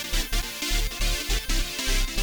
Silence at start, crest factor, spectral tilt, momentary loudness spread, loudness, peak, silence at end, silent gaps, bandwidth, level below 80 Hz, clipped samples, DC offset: 0 s; 14 dB; -2 dB/octave; 2 LU; -27 LUFS; -12 dBFS; 0 s; none; over 20 kHz; -28 dBFS; under 0.1%; under 0.1%